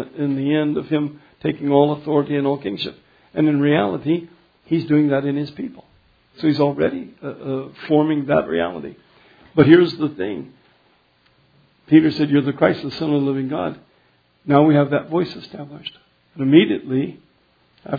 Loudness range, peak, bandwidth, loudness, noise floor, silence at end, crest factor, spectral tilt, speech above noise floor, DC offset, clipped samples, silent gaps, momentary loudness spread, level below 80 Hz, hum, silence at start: 3 LU; 0 dBFS; 5 kHz; -19 LUFS; -59 dBFS; 0 s; 20 dB; -9.5 dB/octave; 41 dB; under 0.1%; under 0.1%; none; 17 LU; -58 dBFS; none; 0 s